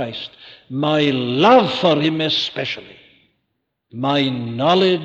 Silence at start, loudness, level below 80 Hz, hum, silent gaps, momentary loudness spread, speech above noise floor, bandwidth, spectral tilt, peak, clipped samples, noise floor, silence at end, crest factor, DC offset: 0 s; -17 LUFS; -62 dBFS; none; none; 17 LU; 56 dB; 8 kHz; -6 dB/octave; -4 dBFS; under 0.1%; -74 dBFS; 0 s; 16 dB; under 0.1%